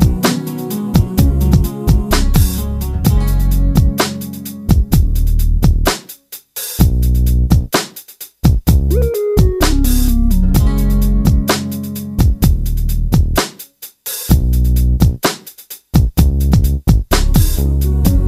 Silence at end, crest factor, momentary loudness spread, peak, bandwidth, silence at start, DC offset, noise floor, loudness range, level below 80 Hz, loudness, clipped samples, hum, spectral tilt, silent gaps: 0 s; 12 dB; 10 LU; 0 dBFS; 16 kHz; 0 s; under 0.1%; -36 dBFS; 2 LU; -14 dBFS; -15 LUFS; under 0.1%; none; -6 dB/octave; none